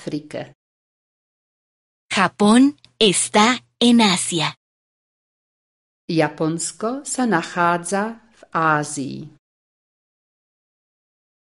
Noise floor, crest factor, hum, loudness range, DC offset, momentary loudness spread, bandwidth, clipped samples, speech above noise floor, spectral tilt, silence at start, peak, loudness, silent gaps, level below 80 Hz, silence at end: under -90 dBFS; 20 dB; none; 8 LU; under 0.1%; 14 LU; 11.5 kHz; under 0.1%; over 71 dB; -3.5 dB/octave; 0 s; -2 dBFS; -19 LUFS; 0.55-2.09 s, 4.57-6.08 s; -62 dBFS; 2.25 s